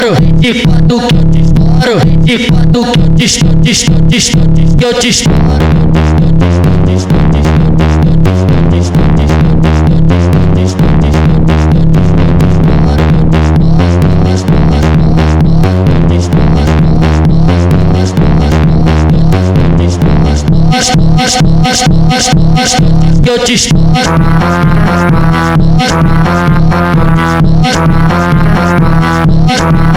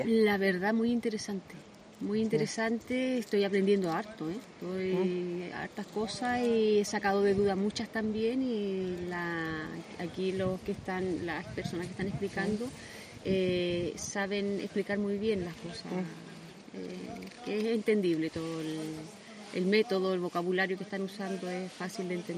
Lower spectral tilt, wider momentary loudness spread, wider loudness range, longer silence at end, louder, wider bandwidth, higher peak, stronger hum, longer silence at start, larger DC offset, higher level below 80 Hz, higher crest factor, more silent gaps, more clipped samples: about the same, -6 dB/octave vs -5.5 dB/octave; second, 1 LU vs 13 LU; second, 1 LU vs 5 LU; about the same, 0 s vs 0 s; first, -7 LUFS vs -32 LUFS; second, 12 kHz vs 15 kHz; first, 0 dBFS vs -14 dBFS; neither; about the same, 0 s vs 0 s; neither; first, -12 dBFS vs -62 dBFS; second, 6 dB vs 18 dB; neither; first, 1% vs under 0.1%